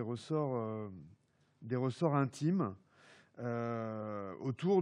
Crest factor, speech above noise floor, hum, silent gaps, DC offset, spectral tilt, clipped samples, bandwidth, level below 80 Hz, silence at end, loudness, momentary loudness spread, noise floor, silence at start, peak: 20 dB; 34 dB; none; none; under 0.1%; -8 dB/octave; under 0.1%; 11 kHz; -84 dBFS; 0 s; -37 LUFS; 12 LU; -70 dBFS; 0 s; -18 dBFS